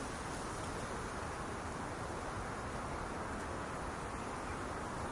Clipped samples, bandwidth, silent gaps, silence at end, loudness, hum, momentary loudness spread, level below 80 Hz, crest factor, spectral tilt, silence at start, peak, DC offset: under 0.1%; 11.5 kHz; none; 0 s; -42 LUFS; none; 1 LU; -52 dBFS; 12 dB; -4.5 dB/octave; 0 s; -30 dBFS; under 0.1%